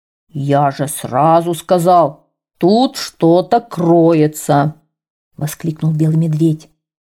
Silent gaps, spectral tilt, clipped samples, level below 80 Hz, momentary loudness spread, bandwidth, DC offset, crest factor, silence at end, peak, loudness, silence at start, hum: 5.10-5.31 s; -7 dB/octave; under 0.1%; -58 dBFS; 10 LU; 16 kHz; under 0.1%; 12 dB; 0.6 s; -2 dBFS; -14 LUFS; 0.35 s; none